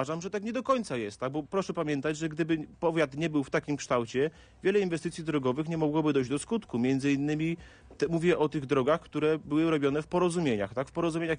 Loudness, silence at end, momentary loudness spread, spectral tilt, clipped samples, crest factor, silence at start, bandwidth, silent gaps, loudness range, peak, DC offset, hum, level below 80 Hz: -30 LUFS; 0 s; 6 LU; -6 dB/octave; under 0.1%; 16 dB; 0 s; 10 kHz; none; 2 LU; -14 dBFS; under 0.1%; none; -60 dBFS